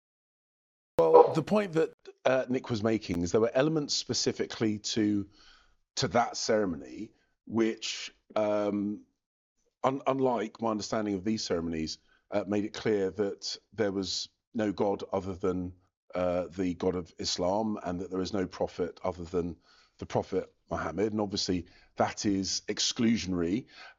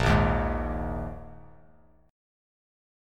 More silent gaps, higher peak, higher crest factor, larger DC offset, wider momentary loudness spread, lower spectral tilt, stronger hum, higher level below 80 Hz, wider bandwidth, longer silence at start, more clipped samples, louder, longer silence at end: first, 1.94-1.98 s, 9.26-9.55 s, 14.47-14.52 s, 15.97-16.08 s vs none; first, -4 dBFS vs -10 dBFS; first, 26 dB vs 20 dB; neither; second, 9 LU vs 21 LU; second, -4.5 dB/octave vs -7 dB/octave; neither; second, -64 dBFS vs -36 dBFS; second, 8 kHz vs 12 kHz; first, 1 s vs 0 s; neither; about the same, -30 LUFS vs -28 LUFS; second, 0.05 s vs 0.95 s